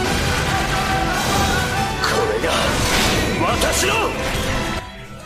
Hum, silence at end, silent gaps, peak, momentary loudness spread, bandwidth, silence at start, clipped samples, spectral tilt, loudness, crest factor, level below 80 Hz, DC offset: none; 0 s; none; -4 dBFS; 5 LU; 15.5 kHz; 0 s; under 0.1%; -3.5 dB/octave; -18 LUFS; 16 dB; -30 dBFS; under 0.1%